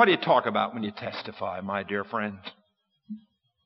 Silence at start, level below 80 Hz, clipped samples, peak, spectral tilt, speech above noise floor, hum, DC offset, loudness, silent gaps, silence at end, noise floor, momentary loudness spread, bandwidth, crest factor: 0 s; -76 dBFS; under 0.1%; -4 dBFS; -2.5 dB/octave; 38 dB; none; under 0.1%; -28 LUFS; none; 0.5 s; -65 dBFS; 21 LU; 6 kHz; 24 dB